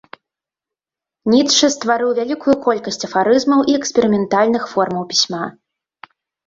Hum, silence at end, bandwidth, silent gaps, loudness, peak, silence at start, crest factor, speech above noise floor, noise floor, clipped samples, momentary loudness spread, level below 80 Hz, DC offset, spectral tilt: none; 0.95 s; 7.8 kHz; none; -16 LUFS; 0 dBFS; 1.25 s; 16 dB; 71 dB; -87 dBFS; under 0.1%; 7 LU; -58 dBFS; under 0.1%; -3.5 dB/octave